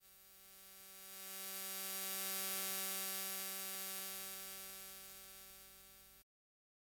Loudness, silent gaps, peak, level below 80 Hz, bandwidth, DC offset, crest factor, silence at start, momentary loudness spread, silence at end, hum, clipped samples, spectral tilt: -43 LUFS; none; -22 dBFS; -80 dBFS; 17 kHz; under 0.1%; 24 dB; 0 s; 19 LU; 0.6 s; none; under 0.1%; 0 dB/octave